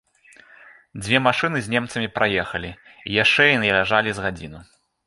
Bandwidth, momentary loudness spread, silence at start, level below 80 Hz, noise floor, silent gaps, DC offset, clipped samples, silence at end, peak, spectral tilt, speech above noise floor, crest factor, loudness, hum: 11.5 kHz; 21 LU; 0.65 s; -50 dBFS; -51 dBFS; none; under 0.1%; under 0.1%; 0.45 s; -2 dBFS; -4.5 dB/octave; 30 dB; 20 dB; -19 LUFS; none